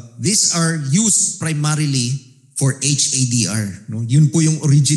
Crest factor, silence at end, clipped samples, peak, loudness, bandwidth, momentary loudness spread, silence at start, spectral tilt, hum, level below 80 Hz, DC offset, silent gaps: 14 dB; 0 s; under 0.1%; -4 dBFS; -16 LUFS; 12.5 kHz; 10 LU; 0.05 s; -4 dB/octave; none; -60 dBFS; under 0.1%; none